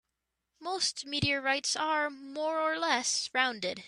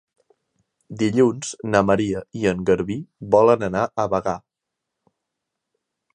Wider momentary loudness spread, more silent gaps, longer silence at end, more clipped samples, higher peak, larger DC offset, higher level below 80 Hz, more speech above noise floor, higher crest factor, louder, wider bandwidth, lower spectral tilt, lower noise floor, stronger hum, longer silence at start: second, 7 LU vs 12 LU; neither; second, 0 s vs 1.75 s; neither; second, -12 dBFS vs -2 dBFS; neither; second, -64 dBFS vs -52 dBFS; second, 54 dB vs 63 dB; about the same, 20 dB vs 20 dB; second, -30 LUFS vs -21 LUFS; first, 13.5 kHz vs 10 kHz; second, -2 dB/octave vs -6 dB/octave; about the same, -85 dBFS vs -83 dBFS; neither; second, 0.6 s vs 0.9 s